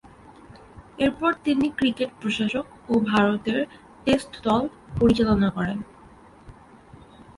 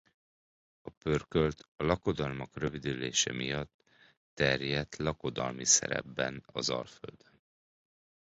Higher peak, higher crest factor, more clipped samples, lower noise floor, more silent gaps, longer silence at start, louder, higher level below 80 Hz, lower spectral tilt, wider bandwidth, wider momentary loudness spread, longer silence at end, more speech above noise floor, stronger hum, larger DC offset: first, -6 dBFS vs -12 dBFS; second, 18 dB vs 24 dB; neither; second, -49 dBFS vs under -90 dBFS; second, none vs 0.97-1.01 s, 1.68-1.76 s, 3.74-3.79 s, 4.17-4.37 s; second, 0.5 s vs 0.85 s; first, -24 LUFS vs -32 LUFS; first, -46 dBFS vs -54 dBFS; first, -6.5 dB/octave vs -3 dB/octave; first, 11.5 kHz vs 8.4 kHz; second, 10 LU vs 14 LU; second, 0.85 s vs 1.2 s; second, 26 dB vs over 57 dB; neither; neither